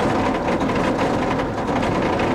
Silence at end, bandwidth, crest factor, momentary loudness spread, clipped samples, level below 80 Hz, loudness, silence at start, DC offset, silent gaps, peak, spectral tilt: 0 s; 13.5 kHz; 12 dB; 2 LU; under 0.1%; -38 dBFS; -21 LUFS; 0 s; under 0.1%; none; -8 dBFS; -6 dB/octave